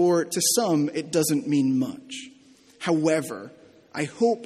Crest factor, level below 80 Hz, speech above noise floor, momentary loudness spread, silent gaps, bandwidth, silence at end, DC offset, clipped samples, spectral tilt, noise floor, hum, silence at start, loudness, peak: 16 dB; -70 dBFS; 30 dB; 16 LU; none; 15 kHz; 0 s; under 0.1%; under 0.1%; -4 dB/octave; -54 dBFS; none; 0 s; -24 LUFS; -10 dBFS